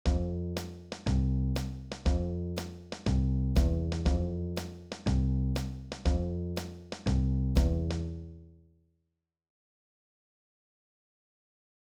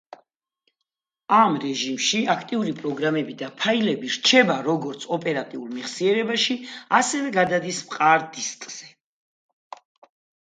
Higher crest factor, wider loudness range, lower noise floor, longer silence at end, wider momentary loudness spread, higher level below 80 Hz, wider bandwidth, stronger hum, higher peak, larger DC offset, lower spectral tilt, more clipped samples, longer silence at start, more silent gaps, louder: about the same, 18 dB vs 22 dB; about the same, 4 LU vs 2 LU; about the same, -83 dBFS vs -83 dBFS; first, 3.5 s vs 1.55 s; about the same, 10 LU vs 12 LU; first, -34 dBFS vs -72 dBFS; first, 14 kHz vs 9.6 kHz; neither; second, -14 dBFS vs -2 dBFS; neither; first, -7 dB/octave vs -3 dB/octave; neither; second, 0.05 s vs 1.3 s; neither; second, -32 LUFS vs -22 LUFS